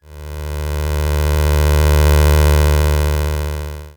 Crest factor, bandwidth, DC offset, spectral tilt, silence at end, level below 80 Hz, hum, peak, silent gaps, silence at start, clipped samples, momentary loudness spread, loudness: 14 dB; over 20 kHz; under 0.1%; -6 dB/octave; 0.05 s; -16 dBFS; none; 0 dBFS; none; 0.1 s; under 0.1%; 13 LU; -15 LUFS